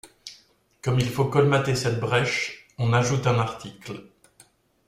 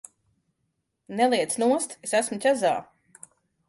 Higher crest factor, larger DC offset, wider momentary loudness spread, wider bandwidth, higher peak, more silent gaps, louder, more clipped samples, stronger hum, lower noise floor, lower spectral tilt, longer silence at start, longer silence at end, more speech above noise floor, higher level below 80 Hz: about the same, 18 dB vs 16 dB; neither; first, 19 LU vs 5 LU; first, 15 kHz vs 12 kHz; about the same, -8 dBFS vs -10 dBFS; neither; about the same, -24 LUFS vs -24 LUFS; neither; neither; second, -58 dBFS vs -77 dBFS; first, -5.5 dB/octave vs -3 dB/octave; second, 0.05 s vs 1.1 s; about the same, 0.85 s vs 0.85 s; second, 35 dB vs 53 dB; first, -54 dBFS vs -74 dBFS